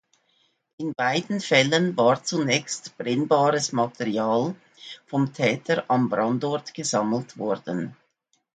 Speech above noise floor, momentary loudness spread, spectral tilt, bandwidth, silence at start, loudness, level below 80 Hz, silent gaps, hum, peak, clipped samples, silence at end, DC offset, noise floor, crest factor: 47 dB; 11 LU; -4.5 dB/octave; 9.4 kHz; 0.8 s; -24 LUFS; -70 dBFS; none; none; -4 dBFS; under 0.1%; 0.6 s; under 0.1%; -71 dBFS; 20 dB